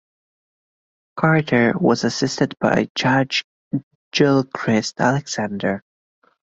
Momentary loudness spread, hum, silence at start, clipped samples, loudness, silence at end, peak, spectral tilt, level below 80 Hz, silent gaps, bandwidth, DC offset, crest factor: 12 LU; none; 1.15 s; under 0.1%; -20 LUFS; 0.7 s; -2 dBFS; -5.5 dB/octave; -56 dBFS; 2.90-2.95 s, 3.44-3.71 s, 3.83-4.11 s; 8 kHz; under 0.1%; 18 dB